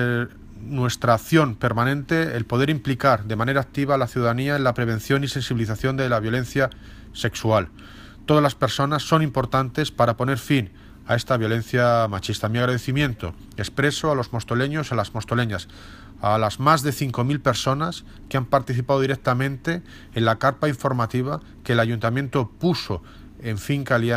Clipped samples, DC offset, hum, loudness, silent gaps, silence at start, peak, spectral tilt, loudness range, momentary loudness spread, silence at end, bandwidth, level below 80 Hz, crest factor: under 0.1%; under 0.1%; none; -22 LUFS; none; 0 s; -2 dBFS; -6 dB/octave; 2 LU; 9 LU; 0 s; 15.5 kHz; -46 dBFS; 20 dB